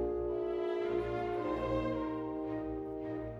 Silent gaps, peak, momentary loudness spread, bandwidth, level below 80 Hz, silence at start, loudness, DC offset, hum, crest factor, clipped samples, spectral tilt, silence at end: none; -24 dBFS; 5 LU; 7.2 kHz; -52 dBFS; 0 s; -36 LUFS; under 0.1%; none; 12 dB; under 0.1%; -8.5 dB/octave; 0 s